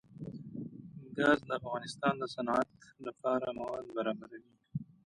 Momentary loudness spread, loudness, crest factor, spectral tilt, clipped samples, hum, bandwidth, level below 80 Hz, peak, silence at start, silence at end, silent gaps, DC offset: 16 LU; -35 LUFS; 22 dB; -6 dB/octave; under 0.1%; none; 11.5 kHz; -70 dBFS; -14 dBFS; 0.1 s; 0.2 s; none; under 0.1%